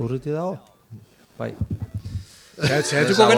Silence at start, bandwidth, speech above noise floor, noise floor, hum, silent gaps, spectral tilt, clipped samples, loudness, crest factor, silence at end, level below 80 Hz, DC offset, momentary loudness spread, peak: 0 s; 17 kHz; 25 dB; -45 dBFS; none; none; -4.5 dB/octave; under 0.1%; -24 LUFS; 22 dB; 0 s; -46 dBFS; under 0.1%; 16 LU; -2 dBFS